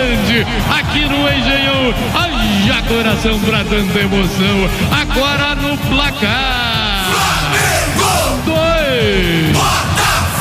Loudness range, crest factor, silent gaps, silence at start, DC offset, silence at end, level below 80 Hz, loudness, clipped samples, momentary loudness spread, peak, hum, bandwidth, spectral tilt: 1 LU; 12 dB; none; 0 s; under 0.1%; 0 s; -24 dBFS; -13 LUFS; under 0.1%; 2 LU; 0 dBFS; none; 16 kHz; -4 dB/octave